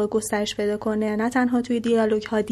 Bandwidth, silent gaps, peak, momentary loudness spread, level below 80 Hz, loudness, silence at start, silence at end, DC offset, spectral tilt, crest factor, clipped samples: 14 kHz; none; -10 dBFS; 4 LU; -54 dBFS; -23 LUFS; 0 s; 0 s; under 0.1%; -5 dB/octave; 12 dB; under 0.1%